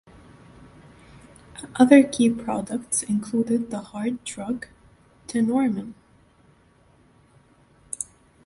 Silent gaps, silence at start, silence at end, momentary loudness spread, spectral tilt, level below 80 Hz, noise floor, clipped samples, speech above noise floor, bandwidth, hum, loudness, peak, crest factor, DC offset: none; 1.55 s; 0.4 s; 22 LU; -4.5 dB/octave; -60 dBFS; -58 dBFS; under 0.1%; 36 dB; 11.5 kHz; none; -23 LUFS; -2 dBFS; 24 dB; under 0.1%